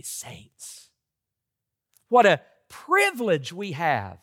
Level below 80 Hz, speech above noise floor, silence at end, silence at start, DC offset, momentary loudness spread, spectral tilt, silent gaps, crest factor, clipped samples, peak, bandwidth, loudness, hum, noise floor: -76 dBFS; 61 dB; 0.1 s; 0.05 s; under 0.1%; 23 LU; -4 dB/octave; none; 20 dB; under 0.1%; -6 dBFS; 17 kHz; -22 LUFS; none; -85 dBFS